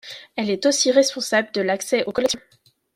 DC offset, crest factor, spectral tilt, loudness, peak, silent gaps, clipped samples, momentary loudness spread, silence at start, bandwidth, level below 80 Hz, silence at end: under 0.1%; 18 dB; -2.5 dB/octave; -20 LUFS; -4 dBFS; none; under 0.1%; 10 LU; 0.05 s; 16 kHz; -62 dBFS; 0.6 s